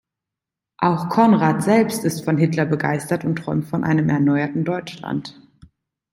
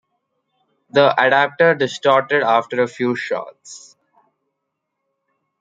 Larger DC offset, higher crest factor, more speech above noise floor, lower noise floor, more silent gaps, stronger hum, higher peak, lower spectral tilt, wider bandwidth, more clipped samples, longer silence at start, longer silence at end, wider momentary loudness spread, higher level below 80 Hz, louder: neither; about the same, 18 dB vs 20 dB; first, 67 dB vs 60 dB; first, -86 dBFS vs -77 dBFS; neither; neither; about the same, -2 dBFS vs 0 dBFS; first, -7 dB/octave vs -4.5 dB/octave; first, 16 kHz vs 9.2 kHz; neither; second, 0.8 s vs 0.95 s; second, 0.8 s vs 1.85 s; about the same, 11 LU vs 12 LU; first, -58 dBFS vs -72 dBFS; second, -20 LUFS vs -17 LUFS